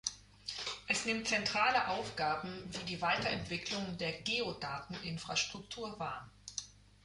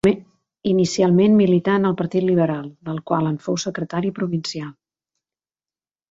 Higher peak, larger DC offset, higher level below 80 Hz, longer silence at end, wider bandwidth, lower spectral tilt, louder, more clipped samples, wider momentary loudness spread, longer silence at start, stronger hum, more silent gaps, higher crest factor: second, -18 dBFS vs -4 dBFS; neither; second, -64 dBFS vs -56 dBFS; second, 0.3 s vs 1.4 s; first, 11.5 kHz vs 8 kHz; second, -2.5 dB/octave vs -6.5 dB/octave; second, -36 LUFS vs -20 LUFS; neither; about the same, 13 LU vs 14 LU; about the same, 0.05 s vs 0.05 s; first, 50 Hz at -60 dBFS vs none; neither; about the same, 20 dB vs 16 dB